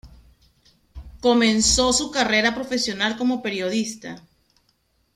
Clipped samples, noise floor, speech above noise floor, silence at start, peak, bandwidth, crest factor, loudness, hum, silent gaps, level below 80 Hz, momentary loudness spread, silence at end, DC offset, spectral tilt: under 0.1%; -66 dBFS; 45 dB; 0.05 s; -4 dBFS; 14.5 kHz; 20 dB; -20 LUFS; none; none; -44 dBFS; 13 LU; 0.95 s; under 0.1%; -2.5 dB/octave